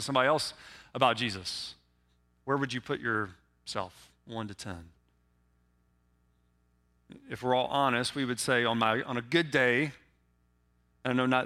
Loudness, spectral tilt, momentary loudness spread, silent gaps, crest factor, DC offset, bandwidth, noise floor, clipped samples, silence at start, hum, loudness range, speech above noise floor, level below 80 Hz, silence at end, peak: -30 LUFS; -4.5 dB/octave; 17 LU; none; 26 dB; under 0.1%; 15.5 kHz; -70 dBFS; under 0.1%; 0 s; 60 Hz at -70 dBFS; 15 LU; 40 dB; -66 dBFS; 0 s; -8 dBFS